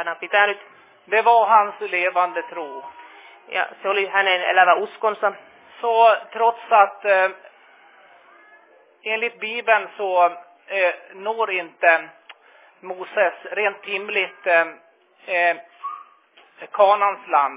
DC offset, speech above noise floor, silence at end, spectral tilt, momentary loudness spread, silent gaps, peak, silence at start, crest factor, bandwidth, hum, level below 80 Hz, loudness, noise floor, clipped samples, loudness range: under 0.1%; 34 dB; 0 s; -5.5 dB/octave; 16 LU; none; -2 dBFS; 0 s; 20 dB; 3.9 kHz; none; under -90 dBFS; -20 LUFS; -54 dBFS; under 0.1%; 5 LU